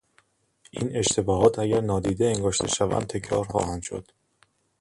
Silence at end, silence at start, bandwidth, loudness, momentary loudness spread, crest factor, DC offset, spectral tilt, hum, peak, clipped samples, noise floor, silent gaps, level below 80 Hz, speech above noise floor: 0.8 s; 0.75 s; 11.5 kHz; -25 LUFS; 12 LU; 20 dB; under 0.1%; -4.5 dB/octave; none; -6 dBFS; under 0.1%; -66 dBFS; none; -46 dBFS; 41 dB